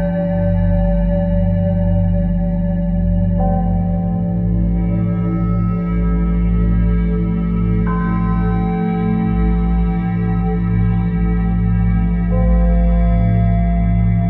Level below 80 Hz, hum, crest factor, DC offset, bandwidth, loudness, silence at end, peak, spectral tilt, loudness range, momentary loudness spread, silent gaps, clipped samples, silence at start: -20 dBFS; none; 10 dB; under 0.1%; 4.1 kHz; -17 LUFS; 0 s; -4 dBFS; -13 dB/octave; 2 LU; 3 LU; none; under 0.1%; 0 s